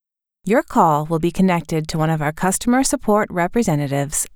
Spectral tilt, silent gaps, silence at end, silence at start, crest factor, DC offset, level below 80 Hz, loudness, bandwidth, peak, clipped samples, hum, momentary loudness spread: -5.5 dB/octave; none; 0.1 s; 0.45 s; 16 dB; under 0.1%; -40 dBFS; -18 LUFS; 20 kHz; -4 dBFS; under 0.1%; none; 5 LU